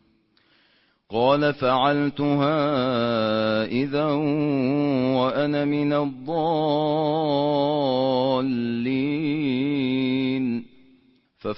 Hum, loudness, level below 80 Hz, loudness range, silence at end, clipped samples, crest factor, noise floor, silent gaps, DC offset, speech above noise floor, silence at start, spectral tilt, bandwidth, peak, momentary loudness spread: none; -23 LUFS; -60 dBFS; 1 LU; 0 s; under 0.1%; 16 dB; -63 dBFS; none; under 0.1%; 41 dB; 1.1 s; -11 dB/octave; 5.8 kHz; -6 dBFS; 4 LU